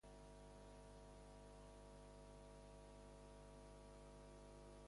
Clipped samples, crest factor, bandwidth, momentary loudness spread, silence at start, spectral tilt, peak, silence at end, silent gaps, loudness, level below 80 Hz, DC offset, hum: under 0.1%; 10 dB; 11.5 kHz; 0 LU; 0.05 s; -5 dB/octave; -50 dBFS; 0 s; none; -62 LUFS; -66 dBFS; under 0.1%; 50 Hz at -65 dBFS